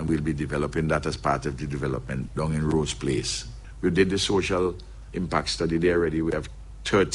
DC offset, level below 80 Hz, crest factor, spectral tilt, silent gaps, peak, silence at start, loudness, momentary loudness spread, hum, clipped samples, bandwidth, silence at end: under 0.1%; -40 dBFS; 18 dB; -5 dB/octave; none; -8 dBFS; 0 s; -26 LUFS; 9 LU; none; under 0.1%; 11.5 kHz; 0 s